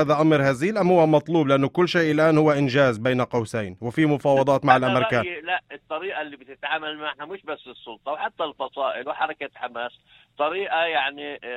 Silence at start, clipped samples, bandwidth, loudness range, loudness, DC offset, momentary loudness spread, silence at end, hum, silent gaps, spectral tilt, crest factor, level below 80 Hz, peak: 0 s; under 0.1%; 12.5 kHz; 10 LU; -22 LUFS; under 0.1%; 15 LU; 0 s; none; none; -6.5 dB/octave; 20 dB; -62 dBFS; -2 dBFS